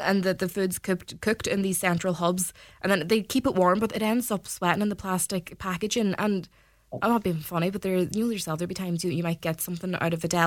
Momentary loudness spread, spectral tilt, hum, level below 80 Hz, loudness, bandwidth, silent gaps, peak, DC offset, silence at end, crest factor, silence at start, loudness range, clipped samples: 7 LU; -5 dB/octave; none; -56 dBFS; -27 LUFS; 18.5 kHz; none; -6 dBFS; under 0.1%; 0 s; 22 dB; 0 s; 3 LU; under 0.1%